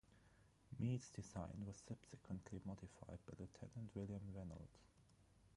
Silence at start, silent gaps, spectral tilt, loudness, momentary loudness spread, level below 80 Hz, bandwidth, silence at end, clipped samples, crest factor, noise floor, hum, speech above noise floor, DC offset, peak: 0.1 s; none; -7 dB/octave; -53 LUFS; 12 LU; -68 dBFS; 11.5 kHz; 0 s; under 0.1%; 20 dB; -73 dBFS; none; 21 dB; under 0.1%; -34 dBFS